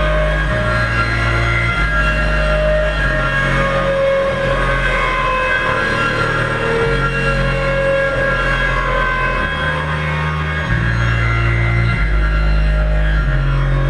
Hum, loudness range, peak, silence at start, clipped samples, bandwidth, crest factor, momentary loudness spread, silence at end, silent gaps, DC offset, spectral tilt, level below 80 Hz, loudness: none; 1 LU; -2 dBFS; 0 s; under 0.1%; 10.5 kHz; 12 dB; 2 LU; 0 s; none; 0.7%; -6 dB/octave; -20 dBFS; -16 LUFS